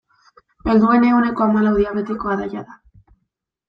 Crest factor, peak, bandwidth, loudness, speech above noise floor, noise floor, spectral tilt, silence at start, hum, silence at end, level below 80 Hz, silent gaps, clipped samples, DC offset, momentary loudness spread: 16 dB; -2 dBFS; 5.6 kHz; -17 LUFS; 58 dB; -75 dBFS; -9 dB/octave; 0.65 s; none; 0.95 s; -44 dBFS; none; under 0.1%; under 0.1%; 13 LU